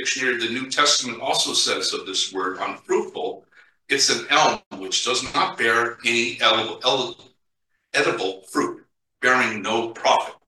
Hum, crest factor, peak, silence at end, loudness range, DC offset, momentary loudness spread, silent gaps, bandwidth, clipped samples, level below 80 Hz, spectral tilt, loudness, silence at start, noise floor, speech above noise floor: none; 20 dB; -4 dBFS; 0.15 s; 3 LU; under 0.1%; 9 LU; 4.66-4.71 s; 12.5 kHz; under 0.1%; -64 dBFS; -1 dB/octave; -21 LUFS; 0 s; -74 dBFS; 52 dB